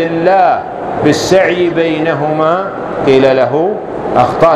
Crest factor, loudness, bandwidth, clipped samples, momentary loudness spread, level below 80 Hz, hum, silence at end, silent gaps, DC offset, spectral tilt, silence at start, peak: 10 dB; -11 LUFS; 14 kHz; 0.2%; 7 LU; -44 dBFS; none; 0 s; none; under 0.1%; -5.5 dB/octave; 0 s; 0 dBFS